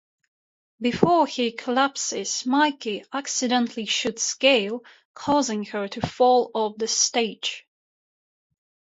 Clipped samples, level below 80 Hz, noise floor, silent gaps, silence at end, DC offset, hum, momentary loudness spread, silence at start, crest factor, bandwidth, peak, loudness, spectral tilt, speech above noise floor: under 0.1%; -60 dBFS; under -90 dBFS; 5.05-5.14 s; 1.25 s; under 0.1%; none; 11 LU; 0.8 s; 22 dB; 8 kHz; -2 dBFS; -23 LUFS; -2.5 dB/octave; over 67 dB